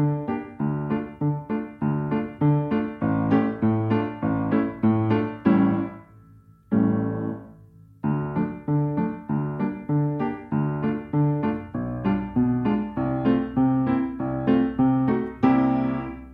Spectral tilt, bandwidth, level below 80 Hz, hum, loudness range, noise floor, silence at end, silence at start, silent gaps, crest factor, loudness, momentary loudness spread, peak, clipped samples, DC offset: -11 dB/octave; 4.8 kHz; -50 dBFS; none; 4 LU; -51 dBFS; 0 s; 0 s; none; 18 dB; -24 LUFS; 7 LU; -6 dBFS; under 0.1%; under 0.1%